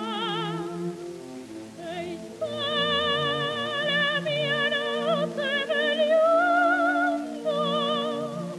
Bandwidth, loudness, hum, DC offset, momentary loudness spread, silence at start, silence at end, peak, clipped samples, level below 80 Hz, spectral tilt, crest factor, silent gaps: 13.5 kHz; -25 LUFS; none; under 0.1%; 15 LU; 0 s; 0 s; -12 dBFS; under 0.1%; -68 dBFS; -4.5 dB/octave; 14 dB; none